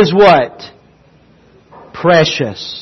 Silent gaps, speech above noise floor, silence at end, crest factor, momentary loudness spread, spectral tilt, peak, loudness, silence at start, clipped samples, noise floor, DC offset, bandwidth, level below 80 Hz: none; 36 dB; 0 s; 14 dB; 21 LU; -5.5 dB/octave; 0 dBFS; -11 LUFS; 0 s; under 0.1%; -47 dBFS; under 0.1%; 6.6 kHz; -46 dBFS